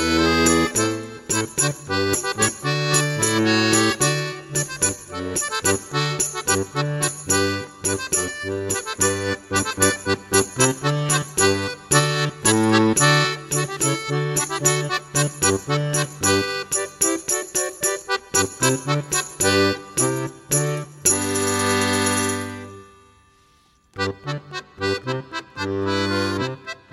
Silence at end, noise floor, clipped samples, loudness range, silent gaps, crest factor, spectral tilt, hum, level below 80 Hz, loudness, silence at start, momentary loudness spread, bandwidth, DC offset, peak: 0.2 s; -58 dBFS; under 0.1%; 6 LU; none; 20 dB; -3 dB/octave; none; -50 dBFS; -20 LUFS; 0 s; 9 LU; 16 kHz; under 0.1%; -2 dBFS